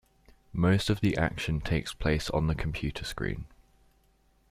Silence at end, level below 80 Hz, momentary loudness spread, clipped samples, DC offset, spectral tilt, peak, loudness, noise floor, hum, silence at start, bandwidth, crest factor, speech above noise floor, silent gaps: 1.05 s; -42 dBFS; 9 LU; under 0.1%; under 0.1%; -6 dB/octave; -12 dBFS; -30 LUFS; -66 dBFS; none; 0.55 s; 15 kHz; 18 dB; 37 dB; none